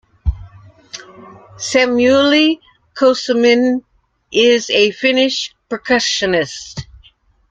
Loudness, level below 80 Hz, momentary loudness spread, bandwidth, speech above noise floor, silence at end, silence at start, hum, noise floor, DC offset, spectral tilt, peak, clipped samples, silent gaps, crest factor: -14 LUFS; -36 dBFS; 20 LU; 9.2 kHz; 36 dB; 0.7 s; 0.25 s; none; -51 dBFS; under 0.1%; -3.5 dB/octave; -2 dBFS; under 0.1%; none; 14 dB